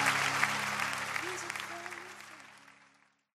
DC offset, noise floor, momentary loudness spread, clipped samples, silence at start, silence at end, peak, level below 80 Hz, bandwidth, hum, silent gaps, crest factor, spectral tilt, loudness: under 0.1%; -67 dBFS; 20 LU; under 0.1%; 0 s; 0.7 s; -10 dBFS; -76 dBFS; 15.5 kHz; none; none; 26 dB; -1.5 dB/octave; -33 LUFS